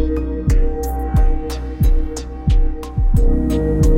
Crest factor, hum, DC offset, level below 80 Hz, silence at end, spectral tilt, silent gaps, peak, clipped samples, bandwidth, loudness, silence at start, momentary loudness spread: 12 dB; none; under 0.1%; -16 dBFS; 0 s; -7.5 dB/octave; none; -4 dBFS; under 0.1%; 15.5 kHz; -20 LUFS; 0 s; 6 LU